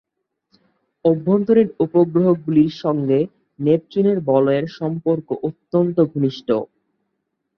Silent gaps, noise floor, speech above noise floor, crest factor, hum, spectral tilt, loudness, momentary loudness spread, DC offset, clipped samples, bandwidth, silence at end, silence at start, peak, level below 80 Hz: none; -75 dBFS; 57 dB; 16 dB; none; -9.5 dB/octave; -19 LUFS; 7 LU; under 0.1%; under 0.1%; 6.2 kHz; 0.95 s; 1.05 s; -4 dBFS; -60 dBFS